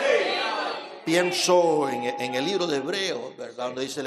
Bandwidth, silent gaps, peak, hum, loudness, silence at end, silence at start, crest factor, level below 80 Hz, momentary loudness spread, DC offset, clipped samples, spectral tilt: 14.5 kHz; none; -8 dBFS; none; -25 LUFS; 0 s; 0 s; 18 dB; -80 dBFS; 12 LU; under 0.1%; under 0.1%; -3 dB/octave